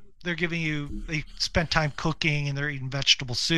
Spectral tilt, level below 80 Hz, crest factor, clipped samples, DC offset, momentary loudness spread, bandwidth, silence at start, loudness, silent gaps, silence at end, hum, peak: -3.5 dB/octave; -42 dBFS; 22 dB; under 0.1%; 0.6%; 10 LU; 12.5 kHz; 0.15 s; -26 LUFS; none; 0 s; none; -4 dBFS